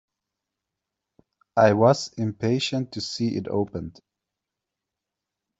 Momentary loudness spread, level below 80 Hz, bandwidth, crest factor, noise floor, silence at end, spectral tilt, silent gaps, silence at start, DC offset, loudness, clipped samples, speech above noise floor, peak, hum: 13 LU; -62 dBFS; 8.2 kHz; 22 dB; -86 dBFS; 1.7 s; -6 dB/octave; none; 1.55 s; under 0.1%; -23 LUFS; under 0.1%; 63 dB; -4 dBFS; none